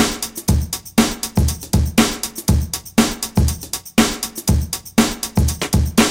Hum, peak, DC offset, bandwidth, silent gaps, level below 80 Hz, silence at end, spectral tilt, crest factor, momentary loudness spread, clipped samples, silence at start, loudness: none; 0 dBFS; under 0.1%; 17 kHz; none; -26 dBFS; 0 s; -4.5 dB/octave; 18 dB; 4 LU; under 0.1%; 0 s; -18 LUFS